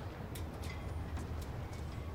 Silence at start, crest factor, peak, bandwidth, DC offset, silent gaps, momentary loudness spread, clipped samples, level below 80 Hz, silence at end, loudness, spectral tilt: 0 s; 12 dB; -30 dBFS; 16.5 kHz; under 0.1%; none; 2 LU; under 0.1%; -48 dBFS; 0 s; -44 LUFS; -6 dB/octave